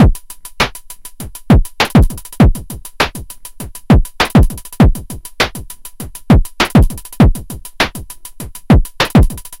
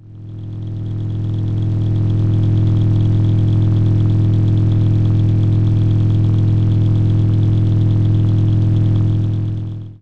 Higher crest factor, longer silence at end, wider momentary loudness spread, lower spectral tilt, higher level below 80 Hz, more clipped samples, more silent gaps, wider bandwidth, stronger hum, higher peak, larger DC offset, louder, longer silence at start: about the same, 12 dB vs 8 dB; about the same, 0.05 s vs 0.05 s; first, 19 LU vs 8 LU; second, -6 dB/octave vs -10.5 dB/octave; first, -18 dBFS vs -28 dBFS; neither; neither; first, 17 kHz vs 4.1 kHz; neither; first, 0 dBFS vs -6 dBFS; neither; about the same, -13 LUFS vs -15 LUFS; about the same, 0 s vs 0.05 s